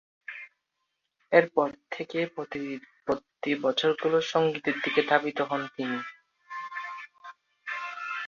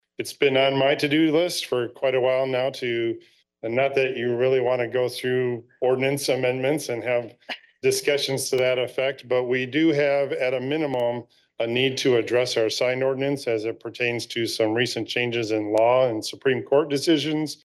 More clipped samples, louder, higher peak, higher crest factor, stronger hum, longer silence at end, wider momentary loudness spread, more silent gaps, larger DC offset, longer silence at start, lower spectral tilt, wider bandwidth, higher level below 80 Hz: neither; second, -28 LUFS vs -23 LUFS; first, -4 dBFS vs -8 dBFS; first, 24 dB vs 16 dB; neither; about the same, 0 s vs 0.1 s; first, 19 LU vs 7 LU; neither; neither; about the same, 0.3 s vs 0.2 s; about the same, -5 dB/octave vs -4.5 dB/octave; second, 7.2 kHz vs 12.5 kHz; about the same, -74 dBFS vs -70 dBFS